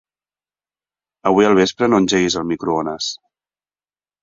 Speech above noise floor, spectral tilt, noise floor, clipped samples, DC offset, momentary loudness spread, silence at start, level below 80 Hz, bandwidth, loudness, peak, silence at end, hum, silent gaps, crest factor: over 74 dB; -4.5 dB/octave; under -90 dBFS; under 0.1%; under 0.1%; 11 LU; 1.25 s; -52 dBFS; 7.8 kHz; -17 LUFS; -2 dBFS; 1.05 s; 50 Hz at -45 dBFS; none; 18 dB